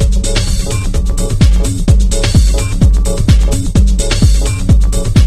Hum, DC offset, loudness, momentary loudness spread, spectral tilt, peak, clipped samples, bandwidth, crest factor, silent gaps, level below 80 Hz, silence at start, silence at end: none; under 0.1%; -12 LUFS; 5 LU; -5.5 dB/octave; 0 dBFS; 0.2%; 13.5 kHz; 10 dB; none; -10 dBFS; 0 s; 0 s